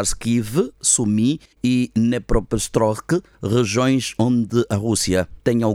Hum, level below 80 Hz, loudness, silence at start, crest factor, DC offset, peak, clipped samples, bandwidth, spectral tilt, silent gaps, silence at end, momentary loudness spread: none; -34 dBFS; -20 LUFS; 0 s; 16 dB; under 0.1%; -4 dBFS; under 0.1%; 16 kHz; -5 dB/octave; none; 0 s; 5 LU